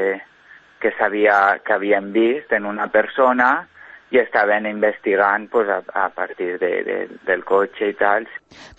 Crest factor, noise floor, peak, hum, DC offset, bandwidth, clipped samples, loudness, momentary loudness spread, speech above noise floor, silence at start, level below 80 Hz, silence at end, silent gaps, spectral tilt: 18 dB; -41 dBFS; -2 dBFS; none; under 0.1%; 7.4 kHz; under 0.1%; -19 LUFS; 9 LU; 23 dB; 0 s; -62 dBFS; 0.1 s; none; -6.5 dB/octave